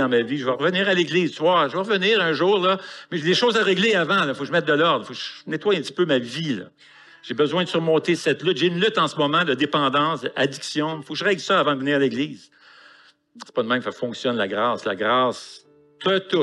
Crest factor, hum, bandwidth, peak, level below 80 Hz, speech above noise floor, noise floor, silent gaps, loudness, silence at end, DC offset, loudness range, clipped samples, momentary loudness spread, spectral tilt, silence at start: 14 dB; none; 11.5 kHz; -8 dBFS; -78 dBFS; 31 dB; -53 dBFS; none; -21 LUFS; 0 s; under 0.1%; 5 LU; under 0.1%; 9 LU; -5 dB/octave; 0 s